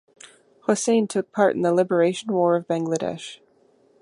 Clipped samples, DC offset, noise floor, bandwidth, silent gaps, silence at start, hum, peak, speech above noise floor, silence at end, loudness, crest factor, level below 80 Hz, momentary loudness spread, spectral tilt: under 0.1%; under 0.1%; -59 dBFS; 11.5 kHz; none; 0.7 s; none; -4 dBFS; 38 dB; 0.65 s; -22 LUFS; 18 dB; -70 dBFS; 10 LU; -5 dB/octave